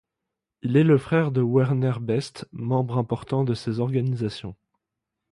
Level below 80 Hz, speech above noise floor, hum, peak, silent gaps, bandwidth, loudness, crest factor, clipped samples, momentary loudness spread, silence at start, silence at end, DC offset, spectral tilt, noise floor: -58 dBFS; 62 dB; none; -6 dBFS; none; 11 kHz; -24 LUFS; 18 dB; under 0.1%; 14 LU; 0.65 s; 0.75 s; under 0.1%; -8 dB/octave; -84 dBFS